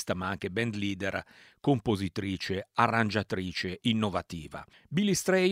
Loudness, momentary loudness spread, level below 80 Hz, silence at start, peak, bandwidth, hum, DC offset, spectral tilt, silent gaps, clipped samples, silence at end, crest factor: -30 LUFS; 10 LU; -58 dBFS; 0 s; -8 dBFS; 16 kHz; none; under 0.1%; -5 dB/octave; none; under 0.1%; 0 s; 22 dB